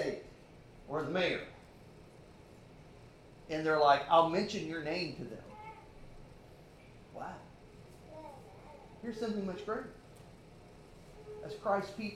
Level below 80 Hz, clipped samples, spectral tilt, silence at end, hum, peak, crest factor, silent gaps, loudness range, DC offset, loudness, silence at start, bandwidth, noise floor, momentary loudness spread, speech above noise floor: -62 dBFS; under 0.1%; -5.5 dB/octave; 0 s; none; -12 dBFS; 24 dB; none; 18 LU; under 0.1%; -34 LUFS; 0 s; 13.5 kHz; -56 dBFS; 28 LU; 23 dB